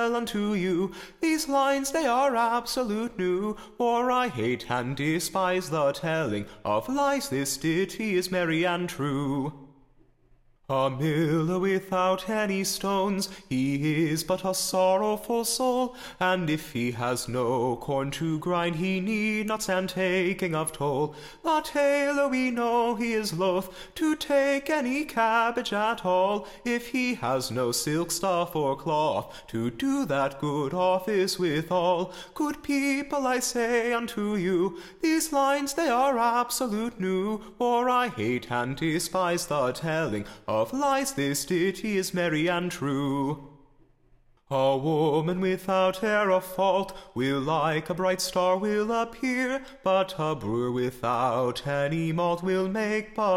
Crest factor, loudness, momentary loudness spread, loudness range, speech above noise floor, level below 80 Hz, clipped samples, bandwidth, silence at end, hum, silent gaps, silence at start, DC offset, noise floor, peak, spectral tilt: 14 dB; -27 LUFS; 5 LU; 2 LU; 34 dB; -56 dBFS; under 0.1%; 16.5 kHz; 0 s; none; none; 0 s; under 0.1%; -60 dBFS; -12 dBFS; -4.5 dB/octave